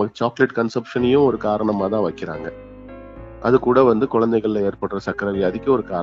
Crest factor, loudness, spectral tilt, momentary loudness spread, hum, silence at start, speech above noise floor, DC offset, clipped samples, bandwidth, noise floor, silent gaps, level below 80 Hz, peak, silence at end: 18 dB; -19 LUFS; -8 dB/octave; 20 LU; none; 0 s; 19 dB; under 0.1%; under 0.1%; 7.4 kHz; -38 dBFS; none; -48 dBFS; 0 dBFS; 0 s